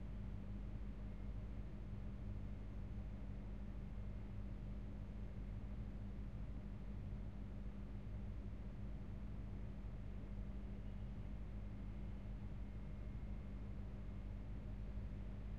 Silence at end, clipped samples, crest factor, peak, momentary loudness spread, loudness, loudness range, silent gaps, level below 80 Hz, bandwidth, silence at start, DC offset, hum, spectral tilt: 0 s; under 0.1%; 12 dB; -36 dBFS; 1 LU; -52 LUFS; 0 LU; none; -50 dBFS; 5.4 kHz; 0 s; 0.2%; 50 Hz at -55 dBFS; -9 dB/octave